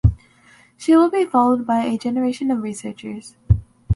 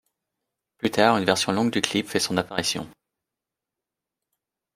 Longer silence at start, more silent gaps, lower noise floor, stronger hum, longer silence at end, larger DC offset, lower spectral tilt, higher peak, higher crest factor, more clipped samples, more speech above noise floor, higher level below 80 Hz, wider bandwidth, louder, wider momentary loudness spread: second, 0.05 s vs 0.85 s; neither; second, -52 dBFS vs -87 dBFS; neither; second, 0 s vs 1.85 s; neither; first, -7.5 dB/octave vs -3.5 dB/octave; about the same, -2 dBFS vs -2 dBFS; second, 18 dB vs 24 dB; neither; second, 33 dB vs 64 dB; first, -32 dBFS vs -62 dBFS; second, 11.5 kHz vs 16 kHz; first, -19 LUFS vs -23 LUFS; first, 17 LU vs 9 LU